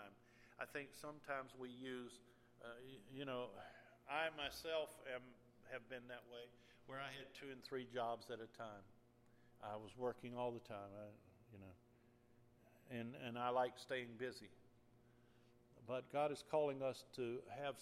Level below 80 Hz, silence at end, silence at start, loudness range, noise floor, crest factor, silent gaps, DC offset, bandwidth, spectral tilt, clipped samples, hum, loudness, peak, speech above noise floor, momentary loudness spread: -80 dBFS; 0 s; 0 s; 6 LU; -72 dBFS; 22 dB; none; under 0.1%; 15.5 kHz; -5 dB/octave; under 0.1%; none; -48 LUFS; -28 dBFS; 24 dB; 19 LU